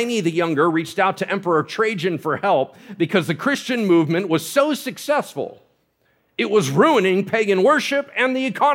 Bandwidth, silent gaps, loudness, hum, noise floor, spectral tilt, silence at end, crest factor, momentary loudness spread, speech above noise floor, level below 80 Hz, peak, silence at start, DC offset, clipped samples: 17 kHz; none; -19 LUFS; none; -64 dBFS; -5 dB/octave; 0 s; 16 dB; 8 LU; 45 dB; -72 dBFS; -2 dBFS; 0 s; under 0.1%; under 0.1%